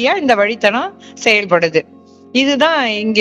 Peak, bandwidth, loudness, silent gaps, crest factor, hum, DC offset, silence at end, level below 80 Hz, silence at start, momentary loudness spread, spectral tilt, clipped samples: 0 dBFS; 11.5 kHz; -14 LUFS; none; 14 dB; none; under 0.1%; 0 s; -62 dBFS; 0 s; 7 LU; -3.5 dB/octave; 0.1%